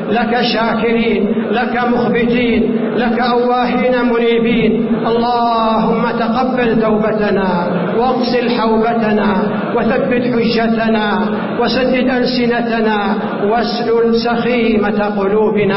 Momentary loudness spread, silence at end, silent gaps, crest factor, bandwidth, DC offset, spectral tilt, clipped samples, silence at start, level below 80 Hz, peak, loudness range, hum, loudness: 2 LU; 0 s; none; 10 dB; 5.8 kHz; under 0.1%; -10 dB/octave; under 0.1%; 0 s; -40 dBFS; -2 dBFS; 1 LU; none; -14 LUFS